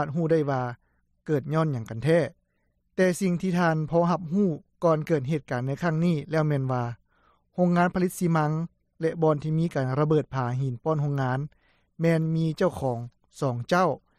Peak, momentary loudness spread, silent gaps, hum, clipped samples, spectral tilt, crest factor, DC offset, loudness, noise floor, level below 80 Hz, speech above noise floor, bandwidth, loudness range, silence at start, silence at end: -10 dBFS; 8 LU; none; none; under 0.1%; -7.5 dB/octave; 16 dB; under 0.1%; -26 LUFS; -72 dBFS; -58 dBFS; 47 dB; 14 kHz; 2 LU; 0 s; 0.2 s